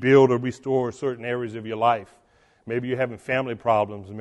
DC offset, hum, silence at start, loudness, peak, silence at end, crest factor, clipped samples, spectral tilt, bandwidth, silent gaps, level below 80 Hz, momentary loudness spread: under 0.1%; none; 0 s; -24 LUFS; -4 dBFS; 0 s; 18 dB; under 0.1%; -7 dB/octave; 9.4 kHz; none; -62 dBFS; 10 LU